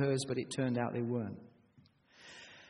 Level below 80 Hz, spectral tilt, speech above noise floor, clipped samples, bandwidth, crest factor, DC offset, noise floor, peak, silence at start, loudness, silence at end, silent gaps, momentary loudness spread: -74 dBFS; -6 dB/octave; 31 dB; under 0.1%; 10.5 kHz; 18 dB; under 0.1%; -66 dBFS; -20 dBFS; 0 s; -36 LUFS; 0 s; none; 18 LU